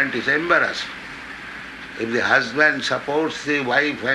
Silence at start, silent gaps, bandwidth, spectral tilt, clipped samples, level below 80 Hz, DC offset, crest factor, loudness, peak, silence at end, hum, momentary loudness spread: 0 s; none; 12 kHz; -4 dB/octave; under 0.1%; -56 dBFS; under 0.1%; 18 dB; -20 LUFS; -2 dBFS; 0 s; none; 16 LU